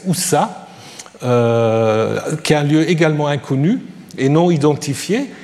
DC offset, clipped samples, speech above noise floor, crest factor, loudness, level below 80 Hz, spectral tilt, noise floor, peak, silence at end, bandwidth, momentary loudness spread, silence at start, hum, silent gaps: under 0.1%; under 0.1%; 22 dB; 14 dB; -16 LUFS; -58 dBFS; -5.5 dB/octave; -37 dBFS; -2 dBFS; 0 s; 14.5 kHz; 12 LU; 0 s; none; none